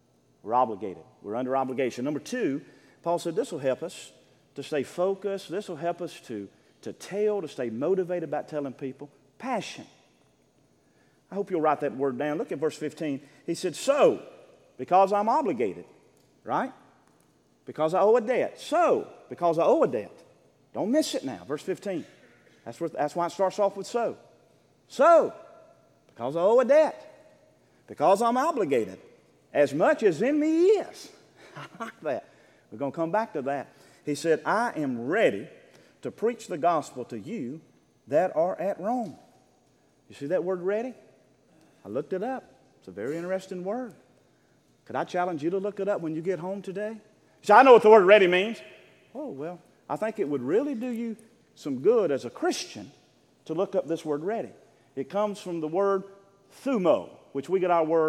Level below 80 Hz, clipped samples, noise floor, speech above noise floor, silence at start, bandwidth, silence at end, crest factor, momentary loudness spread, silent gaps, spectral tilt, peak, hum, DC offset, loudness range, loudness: -80 dBFS; under 0.1%; -64 dBFS; 39 dB; 0.45 s; 14 kHz; 0 s; 24 dB; 18 LU; none; -5.5 dB/octave; -2 dBFS; none; under 0.1%; 11 LU; -26 LUFS